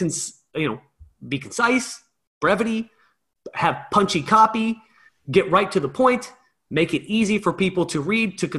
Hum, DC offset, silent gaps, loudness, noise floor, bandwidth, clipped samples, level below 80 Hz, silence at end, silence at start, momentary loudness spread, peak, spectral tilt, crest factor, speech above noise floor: none; under 0.1%; 2.27-2.41 s; -21 LUFS; -64 dBFS; 12.5 kHz; under 0.1%; -56 dBFS; 0 s; 0 s; 12 LU; -4 dBFS; -4.5 dB/octave; 18 dB; 43 dB